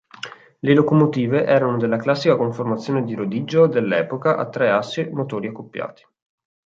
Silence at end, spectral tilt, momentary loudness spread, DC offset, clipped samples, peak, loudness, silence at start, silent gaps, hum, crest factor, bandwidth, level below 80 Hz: 0.85 s; -7.5 dB/octave; 14 LU; under 0.1%; under 0.1%; -2 dBFS; -19 LUFS; 0.25 s; none; none; 18 dB; 7.6 kHz; -64 dBFS